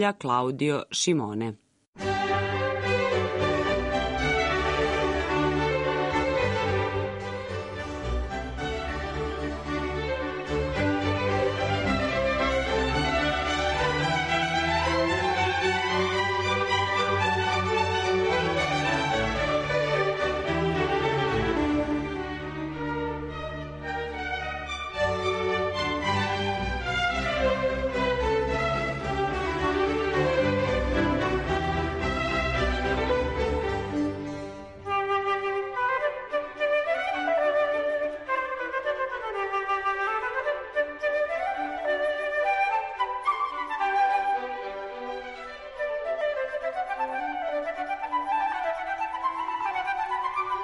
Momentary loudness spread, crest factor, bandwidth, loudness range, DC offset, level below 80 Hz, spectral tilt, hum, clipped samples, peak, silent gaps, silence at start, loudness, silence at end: 8 LU; 16 dB; 11.5 kHz; 5 LU; under 0.1%; -42 dBFS; -5 dB/octave; none; under 0.1%; -12 dBFS; 1.88-1.93 s; 0 s; -27 LUFS; 0 s